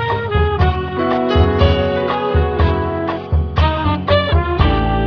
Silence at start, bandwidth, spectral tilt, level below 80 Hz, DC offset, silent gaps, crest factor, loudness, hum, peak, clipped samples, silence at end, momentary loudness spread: 0 s; 5.4 kHz; -8.5 dB/octave; -22 dBFS; under 0.1%; none; 14 dB; -16 LUFS; none; 0 dBFS; under 0.1%; 0 s; 5 LU